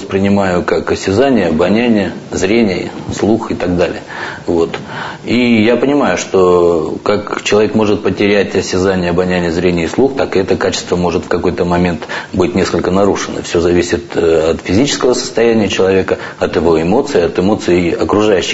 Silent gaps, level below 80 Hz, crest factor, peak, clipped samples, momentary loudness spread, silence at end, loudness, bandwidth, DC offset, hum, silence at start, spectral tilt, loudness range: none; -38 dBFS; 12 dB; 0 dBFS; under 0.1%; 6 LU; 0 s; -13 LUFS; 8 kHz; under 0.1%; none; 0 s; -5.5 dB/octave; 2 LU